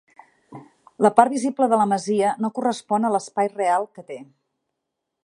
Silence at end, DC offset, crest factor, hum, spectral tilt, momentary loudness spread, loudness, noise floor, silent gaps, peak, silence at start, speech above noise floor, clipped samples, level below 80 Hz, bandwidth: 1 s; under 0.1%; 22 dB; none; -5.5 dB/octave; 13 LU; -21 LUFS; -81 dBFS; none; 0 dBFS; 0.5 s; 60 dB; under 0.1%; -74 dBFS; 11.5 kHz